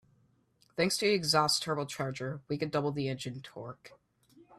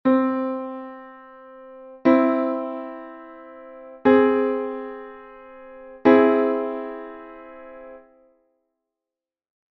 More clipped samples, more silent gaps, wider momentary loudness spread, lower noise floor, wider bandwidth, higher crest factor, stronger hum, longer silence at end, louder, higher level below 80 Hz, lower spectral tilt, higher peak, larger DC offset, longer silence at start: neither; neither; second, 18 LU vs 26 LU; second, -69 dBFS vs -89 dBFS; first, 14 kHz vs 4.9 kHz; about the same, 22 dB vs 22 dB; neither; second, 0.05 s vs 1.75 s; second, -31 LUFS vs -21 LUFS; second, -70 dBFS vs -64 dBFS; about the same, -4 dB/octave vs -4.5 dB/octave; second, -12 dBFS vs -2 dBFS; neither; first, 0.75 s vs 0.05 s